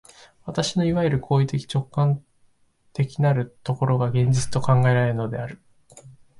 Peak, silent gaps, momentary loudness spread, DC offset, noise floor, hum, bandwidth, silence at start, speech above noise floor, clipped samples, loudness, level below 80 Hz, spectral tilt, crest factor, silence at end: -8 dBFS; none; 10 LU; under 0.1%; -61 dBFS; none; 11.5 kHz; 0.45 s; 40 dB; under 0.1%; -23 LUFS; -50 dBFS; -6.5 dB/octave; 16 dB; 0.3 s